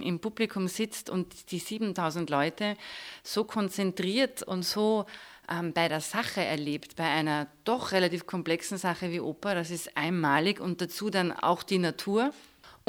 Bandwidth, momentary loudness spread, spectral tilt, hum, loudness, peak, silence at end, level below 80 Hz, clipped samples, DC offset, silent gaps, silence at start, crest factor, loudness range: over 20 kHz; 7 LU; -4.5 dB/octave; none; -30 LUFS; -10 dBFS; 0.15 s; -70 dBFS; under 0.1%; under 0.1%; none; 0 s; 20 dB; 3 LU